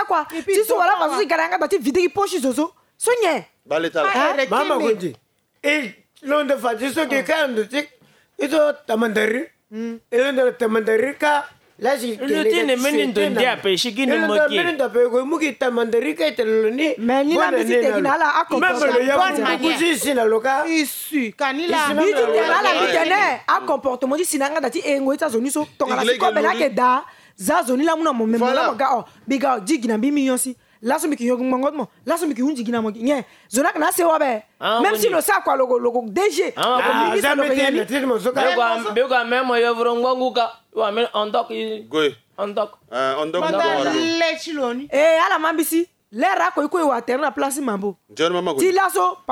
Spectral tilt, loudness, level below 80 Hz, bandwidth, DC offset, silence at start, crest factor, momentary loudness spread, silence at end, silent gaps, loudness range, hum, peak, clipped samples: -3 dB/octave; -19 LUFS; -66 dBFS; 18 kHz; under 0.1%; 0 s; 14 dB; 7 LU; 0 s; none; 3 LU; none; -4 dBFS; under 0.1%